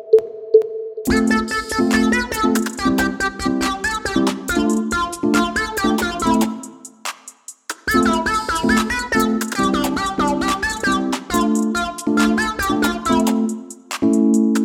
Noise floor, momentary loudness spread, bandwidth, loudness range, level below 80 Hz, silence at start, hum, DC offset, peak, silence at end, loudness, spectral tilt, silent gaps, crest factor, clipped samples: -40 dBFS; 9 LU; 17.5 kHz; 2 LU; -40 dBFS; 0 s; none; under 0.1%; 0 dBFS; 0 s; -18 LUFS; -4 dB/octave; none; 18 dB; under 0.1%